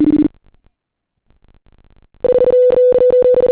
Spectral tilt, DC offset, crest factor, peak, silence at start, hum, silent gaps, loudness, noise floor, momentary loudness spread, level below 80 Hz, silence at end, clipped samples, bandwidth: -11.5 dB/octave; under 0.1%; 8 dB; -6 dBFS; 0 s; none; none; -12 LUFS; -75 dBFS; 7 LU; -44 dBFS; 0 s; under 0.1%; 4 kHz